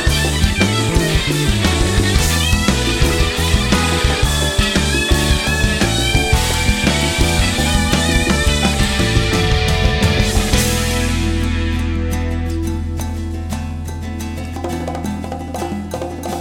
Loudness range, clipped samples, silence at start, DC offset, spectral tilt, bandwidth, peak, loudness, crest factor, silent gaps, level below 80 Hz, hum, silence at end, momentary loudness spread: 8 LU; under 0.1%; 0 s; under 0.1%; -4 dB/octave; 17 kHz; 0 dBFS; -16 LUFS; 16 dB; none; -22 dBFS; none; 0 s; 9 LU